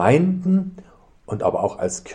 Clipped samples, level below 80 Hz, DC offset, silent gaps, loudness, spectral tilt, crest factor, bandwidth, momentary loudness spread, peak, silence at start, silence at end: under 0.1%; -54 dBFS; under 0.1%; none; -21 LUFS; -7 dB/octave; 18 dB; 10 kHz; 12 LU; -4 dBFS; 0 s; 0 s